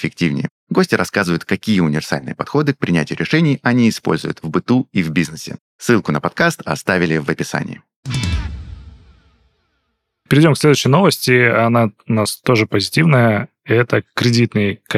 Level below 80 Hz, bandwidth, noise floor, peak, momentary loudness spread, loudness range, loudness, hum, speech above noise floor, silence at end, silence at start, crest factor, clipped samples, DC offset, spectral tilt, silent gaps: -38 dBFS; 15.5 kHz; -70 dBFS; 0 dBFS; 11 LU; 6 LU; -16 LUFS; none; 54 dB; 0 s; 0 s; 16 dB; under 0.1%; under 0.1%; -5.5 dB/octave; 0.51-0.67 s, 5.60-5.79 s, 7.96-8.03 s